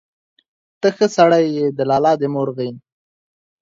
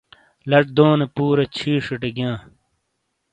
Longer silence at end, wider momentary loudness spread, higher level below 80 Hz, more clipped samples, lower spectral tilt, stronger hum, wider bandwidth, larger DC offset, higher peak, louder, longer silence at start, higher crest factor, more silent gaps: about the same, 0.85 s vs 0.95 s; about the same, 10 LU vs 11 LU; second, -64 dBFS vs -56 dBFS; neither; second, -6 dB/octave vs -7.5 dB/octave; neither; second, 7.8 kHz vs 9 kHz; neither; about the same, -2 dBFS vs 0 dBFS; about the same, -17 LUFS vs -19 LUFS; first, 0.85 s vs 0.45 s; about the same, 18 dB vs 20 dB; neither